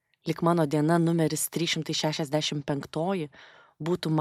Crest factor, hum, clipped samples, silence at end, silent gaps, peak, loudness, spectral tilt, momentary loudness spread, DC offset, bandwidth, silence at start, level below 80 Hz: 18 dB; none; under 0.1%; 0 s; none; -10 dBFS; -27 LUFS; -5 dB/octave; 9 LU; under 0.1%; 15.5 kHz; 0.25 s; -66 dBFS